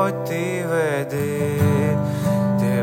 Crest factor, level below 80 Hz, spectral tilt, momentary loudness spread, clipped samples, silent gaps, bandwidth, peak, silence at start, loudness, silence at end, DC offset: 14 dB; -56 dBFS; -7 dB/octave; 5 LU; under 0.1%; none; 17 kHz; -6 dBFS; 0 s; -21 LUFS; 0 s; under 0.1%